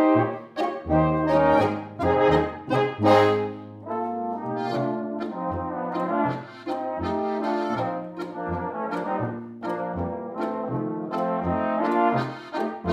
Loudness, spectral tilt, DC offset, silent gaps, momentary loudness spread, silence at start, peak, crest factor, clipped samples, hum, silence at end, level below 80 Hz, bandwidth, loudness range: -25 LUFS; -8 dB/octave; under 0.1%; none; 11 LU; 0 s; -6 dBFS; 20 dB; under 0.1%; none; 0 s; -48 dBFS; 11.5 kHz; 7 LU